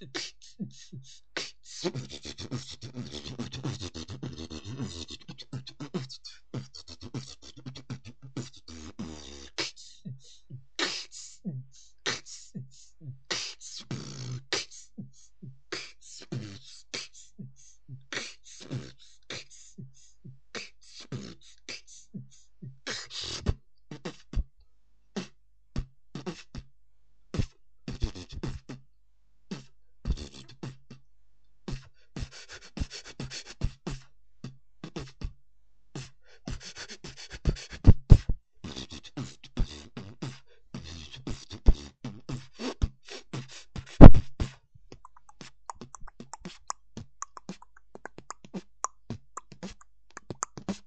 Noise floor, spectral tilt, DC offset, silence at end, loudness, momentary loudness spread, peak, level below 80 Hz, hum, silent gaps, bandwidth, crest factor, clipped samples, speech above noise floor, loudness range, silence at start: -69 dBFS; -6 dB/octave; 0.3%; 0.15 s; -32 LUFS; 15 LU; 0 dBFS; -34 dBFS; none; none; 8.4 kHz; 28 dB; under 0.1%; 30 dB; 20 LU; 0.15 s